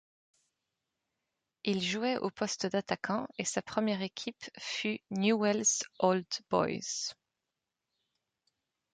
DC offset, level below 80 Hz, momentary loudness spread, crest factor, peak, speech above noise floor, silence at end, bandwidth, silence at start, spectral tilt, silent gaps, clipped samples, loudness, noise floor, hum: under 0.1%; -74 dBFS; 9 LU; 22 dB; -14 dBFS; 56 dB; 1.8 s; 10 kHz; 1.65 s; -3.5 dB/octave; none; under 0.1%; -33 LUFS; -88 dBFS; none